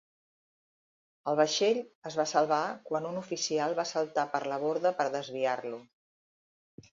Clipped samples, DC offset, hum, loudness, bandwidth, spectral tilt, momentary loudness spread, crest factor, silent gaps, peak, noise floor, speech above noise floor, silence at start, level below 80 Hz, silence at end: under 0.1%; under 0.1%; none; -31 LUFS; 7.6 kHz; -3.5 dB/octave; 9 LU; 20 dB; 1.95-2.02 s; -12 dBFS; under -90 dBFS; over 60 dB; 1.25 s; -82 dBFS; 1.1 s